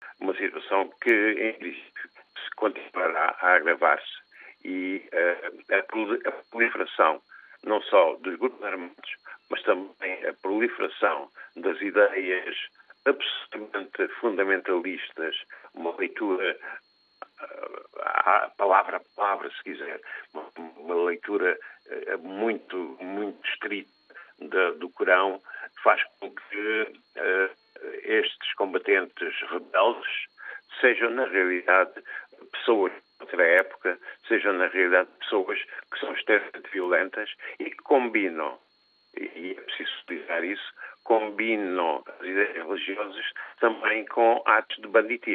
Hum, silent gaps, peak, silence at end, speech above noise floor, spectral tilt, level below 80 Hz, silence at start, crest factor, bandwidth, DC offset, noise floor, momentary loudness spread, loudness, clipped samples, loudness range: none; none; -4 dBFS; 0 s; 39 dB; -5.5 dB/octave; under -90 dBFS; 0 s; 22 dB; 4.6 kHz; under 0.1%; -65 dBFS; 17 LU; -26 LUFS; under 0.1%; 5 LU